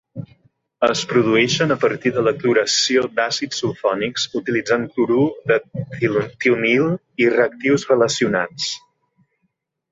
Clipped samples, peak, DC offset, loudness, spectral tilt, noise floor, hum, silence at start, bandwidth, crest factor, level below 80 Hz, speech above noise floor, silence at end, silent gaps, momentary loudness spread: under 0.1%; -2 dBFS; under 0.1%; -18 LUFS; -4 dB/octave; -71 dBFS; none; 0.15 s; 8 kHz; 16 dB; -60 dBFS; 53 dB; 1.15 s; none; 7 LU